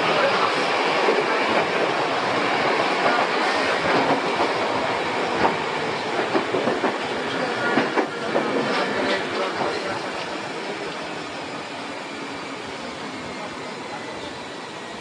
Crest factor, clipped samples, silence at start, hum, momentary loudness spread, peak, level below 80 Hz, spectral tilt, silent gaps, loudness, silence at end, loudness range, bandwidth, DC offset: 20 dB; under 0.1%; 0 s; none; 12 LU; -4 dBFS; -62 dBFS; -4 dB/octave; none; -23 LUFS; 0 s; 10 LU; 10.5 kHz; under 0.1%